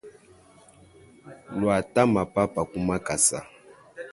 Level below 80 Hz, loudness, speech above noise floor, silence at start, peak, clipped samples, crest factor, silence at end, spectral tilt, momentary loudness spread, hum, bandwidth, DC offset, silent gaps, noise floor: -52 dBFS; -24 LUFS; 30 dB; 0.05 s; -6 dBFS; under 0.1%; 22 dB; 0 s; -4.5 dB/octave; 13 LU; none; 12 kHz; under 0.1%; none; -54 dBFS